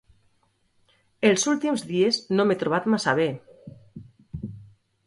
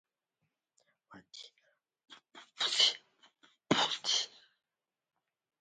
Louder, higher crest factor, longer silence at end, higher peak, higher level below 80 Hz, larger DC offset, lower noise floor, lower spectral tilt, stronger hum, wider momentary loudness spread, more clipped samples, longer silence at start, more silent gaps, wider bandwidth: first, -23 LUFS vs -30 LUFS; second, 20 dB vs 26 dB; second, 0.45 s vs 1.35 s; first, -6 dBFS vs -14 dBFS; first, -58 dBFS vs -86 dBFS; neither; second, -67 dBFS vs -85 dBFS; first, -4 dB/octave vs -1.5 dB/octave; neither; second, 18 LU vs 24 LU; neither; about the same, 1.2 s vs 1.1 s; neither; first, 11.5 kHz vs 9.4 kHz